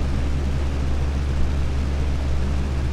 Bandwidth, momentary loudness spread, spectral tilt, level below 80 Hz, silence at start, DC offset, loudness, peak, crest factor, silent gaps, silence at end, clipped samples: 9.6 kHz; 1 LU; -7 dB/octave; -24 dBFS; 0 s; under 0.1%; -25 LUFS; -8 dBFS; 12 dB; none; 0 s; under 0.1%